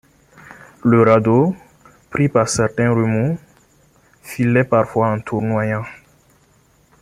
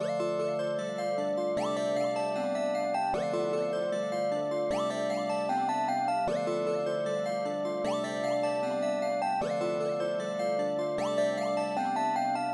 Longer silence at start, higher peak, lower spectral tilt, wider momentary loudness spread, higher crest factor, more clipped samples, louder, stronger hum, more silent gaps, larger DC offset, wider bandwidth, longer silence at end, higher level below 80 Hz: first, 0.5 s vs 0 s; first, 0 dBFS vs -18 dBFS; first, -6.5 dB/octave vs -5 dB/octave; first, 14 LU vs 2 LU; first, 18 dB vs 12 dB; neither; first, -17 LUFS vs -31 LUFS; neither; neither; neither; first, 14.5 kHz vs 11.5 kHz; first, 1.05 s vs 0 s; first, -52 dBFS vs -66 dBFS